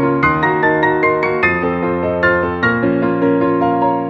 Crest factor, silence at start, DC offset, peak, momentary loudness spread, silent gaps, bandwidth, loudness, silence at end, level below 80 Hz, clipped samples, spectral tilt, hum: 14 dB; 0 s; under 0.1%; 0 dBFS; 3 LU; none; 6.2 kHz; -15 LUFS; 0 s; -42 dBFS; under 0.1%; -8.5 dB/octave; none